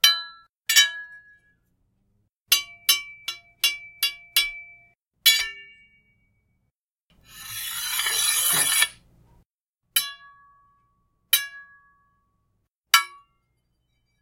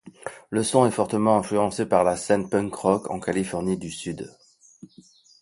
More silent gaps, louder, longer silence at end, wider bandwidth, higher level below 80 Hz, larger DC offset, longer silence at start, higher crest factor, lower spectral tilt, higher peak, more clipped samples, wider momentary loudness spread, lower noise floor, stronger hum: first, 0.49-0.54 s, 2.37-2.46 s, 6.83-6.96 s, 7.02-7.06 s, 9.46-9.73 s, 12.76-12.83 s vs none; first, -21 LUFS vs -24 LUFS; about the same, 1.15 s vs 1.1 s; first, 16.5 kHz vs 11.5 kHz; second, -66 dBFS vs -56 dBFS; neither; about the same, 0.05 s vs 0.05 s; first, 28 dB vs 20 dB; second, 3 dB/octave vs -5.5 dB/octave; first, 0 dBFS vs -4 dBFS; neither; first, 18 LU vs 13 LU; first, -79 dBFS vs -53 dBFS; neither